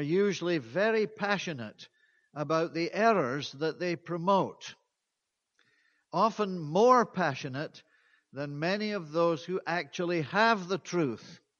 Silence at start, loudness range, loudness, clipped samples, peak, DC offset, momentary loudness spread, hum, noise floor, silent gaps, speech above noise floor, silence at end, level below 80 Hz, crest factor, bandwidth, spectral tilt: 0 s; 3 LU; -30 LUFS; under 0.1%; -10 dBFS; under 0.1%; 13 LU; none; -85 dBFS; none; 56 dB; 0.25 s; -78 dBFS; 20 dB; 7.2 kHz; -5.5 dB/octave